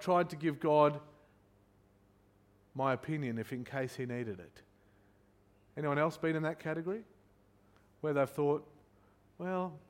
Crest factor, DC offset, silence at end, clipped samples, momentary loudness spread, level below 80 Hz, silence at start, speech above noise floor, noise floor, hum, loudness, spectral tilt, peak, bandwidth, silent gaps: 22 dB; under 0.1%; 0.1 s; under 0.1%; 14 LU; -74 dBFS; 0 s; 33 dB; -67 dBFS; 50 Hz at -70 dBFS; -35 LUFS; -7.5 dB/octave; -14 dBFS; 16.5 kHz; none